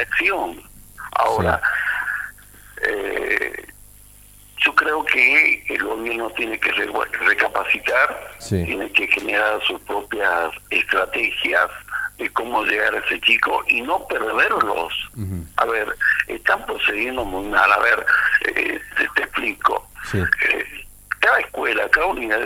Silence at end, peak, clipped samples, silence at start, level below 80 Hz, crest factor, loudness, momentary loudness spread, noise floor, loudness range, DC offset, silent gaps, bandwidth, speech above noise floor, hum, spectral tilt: 0 s; 0 dBFS; under 0.1%; 0 s; -46 dBFS; 20 dB; -19 LUFS; 10 LU; -46 dBFS; 4 LU; under 0.1%; none; 17 kHz; 26 dB; 50 Hz at -50 dBFS; -4 dB/octave